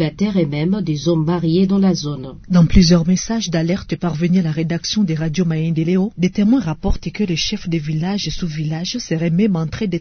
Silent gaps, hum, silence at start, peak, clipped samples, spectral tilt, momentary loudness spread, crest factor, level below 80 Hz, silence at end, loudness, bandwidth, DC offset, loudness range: none; none; 0 s; 0 dBFS; under 0.1%; -6 dB/octave; 8 LU; 16 dB; -30 dBFS; 0 s; -18 LUFS; 6.6 kHz; under 0.1%; 4 LU